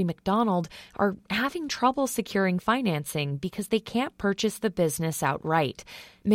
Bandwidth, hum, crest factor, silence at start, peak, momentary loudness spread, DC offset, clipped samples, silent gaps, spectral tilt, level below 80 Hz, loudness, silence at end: 16.5 kHz; none; 18 dB; 0 s; -8 dBFS; 6 LU; under 0.1%; under 0.1%; none; -5 dB/octave; -58 dBFS; -27 LUFS; 0 s